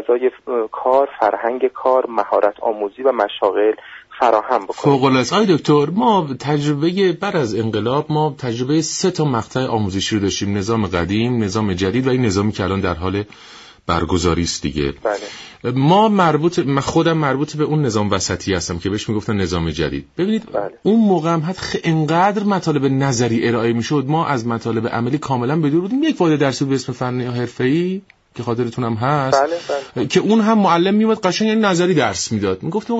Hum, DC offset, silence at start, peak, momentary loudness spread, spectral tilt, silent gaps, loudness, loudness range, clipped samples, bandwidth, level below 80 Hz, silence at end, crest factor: none; under 0.1%; 0 s; -2 dBFS; 8 LU; -5.5 dB/octave; none; -18 LUFS; 3 LU; under 0.1%; 8 kHz; -44 dBFS; 0 s; 14 dB